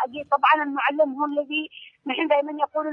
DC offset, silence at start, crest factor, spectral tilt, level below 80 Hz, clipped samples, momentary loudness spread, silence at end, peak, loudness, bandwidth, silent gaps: under 0.1%; 0 s; 18 dB; -5.5 dB/octave; -76 dBFS; under 0.1%; 10 LU; 0 s; -6 dBFS; -23 LUFS; 5.6 kHz; none